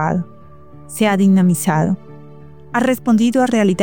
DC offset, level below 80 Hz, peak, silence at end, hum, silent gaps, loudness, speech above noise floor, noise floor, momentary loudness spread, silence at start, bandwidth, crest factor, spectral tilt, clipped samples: 0.8%; -52 dBFS; -4 dBFS; 0 s; none; none; -16 LUFS; 27 dB; -41 dBFS; 11 LU; 0 s; 19 kHz; 12 dB; -6 dB/octave; under 0.1%